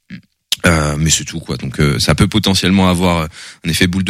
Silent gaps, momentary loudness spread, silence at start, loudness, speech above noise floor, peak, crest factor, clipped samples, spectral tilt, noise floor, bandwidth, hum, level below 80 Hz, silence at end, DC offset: none; 11 LU; 0.1 s; -14 LUFS; 23 dB; 0 dBFS; 14 dB; under 0.1%; -4.5 dB/octave; -37 dBFS; 16 kHz; none; -30 dBFS; 0 s; under 0.1%